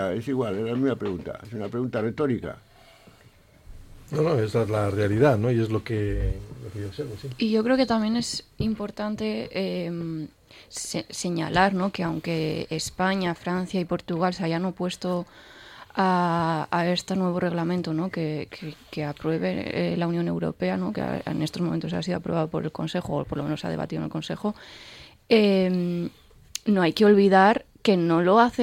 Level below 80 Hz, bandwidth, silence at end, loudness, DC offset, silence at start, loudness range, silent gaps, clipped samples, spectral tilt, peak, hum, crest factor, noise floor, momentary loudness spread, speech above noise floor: -46 dBFS; 16 kHz; 0 s; -25 LUFS; under 0.1%; 0 s; 6 LU; none; under 0.1%; -6 dB/octave; -6 dBFS; none; 20 dB; -54 dBFS; 13 LU; 30 dB